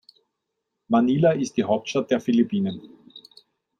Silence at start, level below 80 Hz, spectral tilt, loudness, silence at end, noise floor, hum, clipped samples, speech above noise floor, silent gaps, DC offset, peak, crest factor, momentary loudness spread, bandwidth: 0.9 s; -66 dBFS; -6.5 dB/octave; -22 LUFS; 0.6 s; -80 dBFS; none; under 0.1%; 59 dB; none; under 0.1%; -8 dBFS; 18 dB; 7 LU; 9.4 kHz